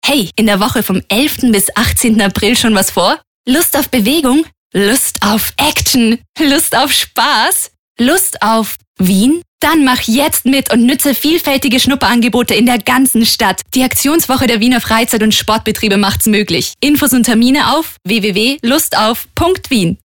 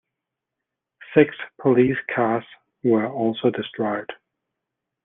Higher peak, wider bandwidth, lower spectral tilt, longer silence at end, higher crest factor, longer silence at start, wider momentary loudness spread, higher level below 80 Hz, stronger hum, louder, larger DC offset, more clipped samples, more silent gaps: about the same, -2 dBFS vs -2 dBFS; first, 19 kHz vs 3.9 kHz; second, -3 dB/octave vs -10 dB/octave; second, 0.1 s vs 0.9 s; second, 10 dB vs 22 dB; second, 0.05 s vs 1 s; second, 5 LU vs 8 LU; first, -36 dBFS vs -64 dBFS; neither; first, -11 LUFS vs -22 LUFS; neither; neither; first, 3.27-3.44 s, 4.57-4.70 s, 6.29-6.34 s, 7.78-7.95 s, 8.87-8.95 s, 9.48-9.59 s vs none